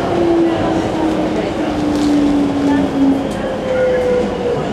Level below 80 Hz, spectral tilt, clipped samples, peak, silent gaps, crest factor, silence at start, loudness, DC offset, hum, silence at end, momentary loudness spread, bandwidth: -36 dBFS; -6.5 dB/octave; under 0.1%; -2 dBFS; none; 12 dB; 0 s; -15 LUFS; under 0.1%; none; 0 s; 5 LU; 12 kHz